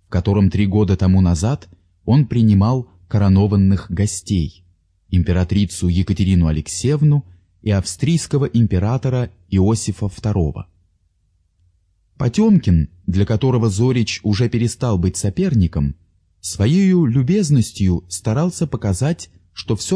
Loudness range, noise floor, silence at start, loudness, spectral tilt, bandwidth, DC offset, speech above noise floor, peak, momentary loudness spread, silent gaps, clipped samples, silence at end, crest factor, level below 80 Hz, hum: 4 LU; -62 dBFS; 0.1 s; -18 LUFS; -7 dB/octave; 11 kHz; under 0.1%; 46 dB; -4 dBFS; 9 LU; none; under 0.1%; 0 s; 14 dB; -34 dBFS; none